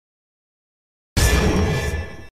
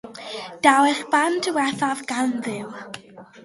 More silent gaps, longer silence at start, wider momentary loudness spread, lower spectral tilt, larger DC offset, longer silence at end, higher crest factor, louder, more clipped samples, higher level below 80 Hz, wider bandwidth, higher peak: neither; first, 1.15 s vs 0.05 s; second, 9 LU vs 18 LU; first, -4.5 dB/octave vs -3 dB/octave; neither; about the same, 0.05 s vs 0.05 s; about the same, 16 dB vs 20 dB; about the same, -20 LUFS vs -21 LUFS; neither; first, -26 dBFS vs -70 dBFS; first, 16 kHz vs 11.5 kHz; second, -6 dBFS vs -2 dBFS